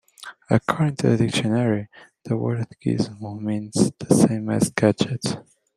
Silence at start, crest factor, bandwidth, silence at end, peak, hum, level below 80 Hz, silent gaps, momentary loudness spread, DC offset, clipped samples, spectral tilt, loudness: 0.2 s; 20 dB; 13.5 kHz; 0.35 s; -2 dBFS; none; -56 dBFS; none; 10 LU; under 0.1%; under 0.1%; -6 dB/octave; -22 LUFS